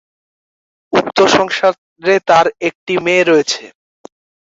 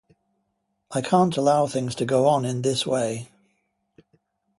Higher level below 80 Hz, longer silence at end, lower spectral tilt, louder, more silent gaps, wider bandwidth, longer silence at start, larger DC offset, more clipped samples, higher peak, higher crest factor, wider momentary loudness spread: first, -56 dBFS vs -64 dBFS; second, 0.75 s vs 1.35 s; second, -3.5 dB/octave vs -5.5 dB/octave; first, -13 LUFS vs -23 LUFS; first, 1.78-1.96 s, 2.75-2.86 s vs none; second, 7.8 kHz vs 11.5 kHz; about the same, 0.9 s vs 0.9 s; neither; neither; first, 0 dBFS vs -6 dBFS; second, 14 dB vs 20 dB; about the same, 9 LU vs 9 LU